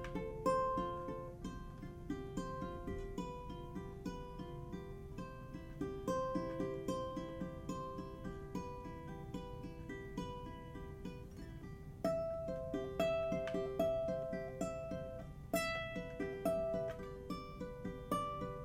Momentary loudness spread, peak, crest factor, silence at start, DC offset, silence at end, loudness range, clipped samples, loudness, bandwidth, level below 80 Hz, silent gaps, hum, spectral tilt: 12 LU; -24 dBFS; 18 dB; 0 s; under 0.1%; 0 s; 8 LU; under 0.1%; -43 LUFS; 16.5 kHz; -56 dBFS; none; none; -6 dB/octave